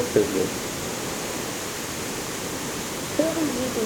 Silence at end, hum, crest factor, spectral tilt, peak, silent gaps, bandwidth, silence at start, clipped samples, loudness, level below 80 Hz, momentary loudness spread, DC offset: 0 s; none; 20 dB; -3.5 dB/octave; -6 dBFS; none; over 20 kHz; 0 s; under 0.1%; -27 LUFS; -52 dBFS; 6 LU; under 0.1%